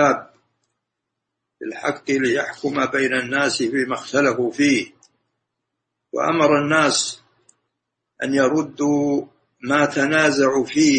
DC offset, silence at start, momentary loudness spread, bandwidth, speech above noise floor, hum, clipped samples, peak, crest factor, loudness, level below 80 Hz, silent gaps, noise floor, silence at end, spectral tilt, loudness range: under 0.1%; 0 s; 10 LU; 8.8 kHz; 61 dB; none; under 0.1%; -2 dBFS; 18 dB; -19 LUFS; -62 dBFS; none; -80 dBFS; 0 s; -4 dB/octave; 2 LU